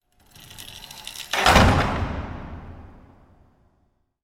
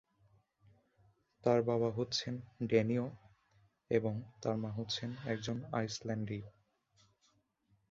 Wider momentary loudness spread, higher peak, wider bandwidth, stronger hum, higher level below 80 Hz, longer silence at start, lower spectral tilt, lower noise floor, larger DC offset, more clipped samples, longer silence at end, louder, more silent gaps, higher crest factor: first, 25 LU vs 10 LU; first, -2 dBFS vs -16 dBFS; first, 17 kHz vs 7.6 kHz; neither; first, -34 dBFS vs -70 dBFS; second, 0.6 s vs 1.45 s; about the same, -4.5 dB/octave vs -5.5 dB/octave; second, -67 dBFS vs -76 dBFS; neither; neither; about the same, 1.4 s vs 1.4 s; first, -19 LUFS vs -37 LUFS; neither; about the same, 24 dB vs 22 dB